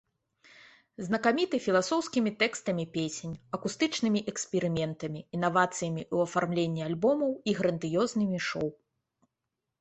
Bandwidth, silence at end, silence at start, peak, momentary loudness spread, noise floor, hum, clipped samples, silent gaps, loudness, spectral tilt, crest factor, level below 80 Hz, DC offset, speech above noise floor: 8.4 kHz; 1.05 s; 1 s; -10 dBFS; 8 LU; -86 dBFS; none; under 0.1%; none; -30 LUFS; -5 dB/octave; 20 dB; -66 dBFS; under 0.1%; 57 dB